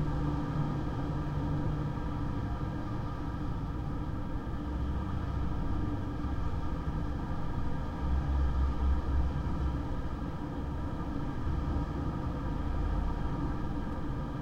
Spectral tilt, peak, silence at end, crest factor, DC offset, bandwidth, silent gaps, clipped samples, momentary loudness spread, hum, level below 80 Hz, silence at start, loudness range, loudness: -8.5 dB/octave; -20 dBFS; 0 s; 12 dB; under 0.1%; 7.4 kHz; none; under 0.1%; 5 LU; none; -36 dBFS; 0 s; 3 LU; -35 LUFS